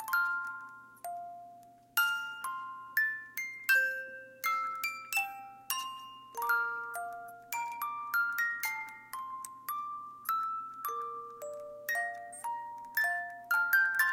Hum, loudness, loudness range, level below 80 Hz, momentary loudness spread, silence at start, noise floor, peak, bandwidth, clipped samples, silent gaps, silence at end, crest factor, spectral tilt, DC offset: none; -34 LUFS; 5 LU; -84 dBFS; 15 LU; 0 s; -56 dBFS; -14 dBFS; 17 kHz; under 0.1%; none; 0 s; 20 dB; 0.5 dB/octave; under 0.1%